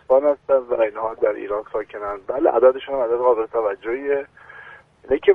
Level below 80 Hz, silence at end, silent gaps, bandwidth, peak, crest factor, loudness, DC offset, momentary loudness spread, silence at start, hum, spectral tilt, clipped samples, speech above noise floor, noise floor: -54 dBFS; 0 s; none; 3.7 kHz; -2 dBFS; 18 dB; -21 LUFS; under 0.1%; 12 LU; 0.1 s; none; -7.5 dB/octave; under 0.1%; 24 dB; -44 dBFS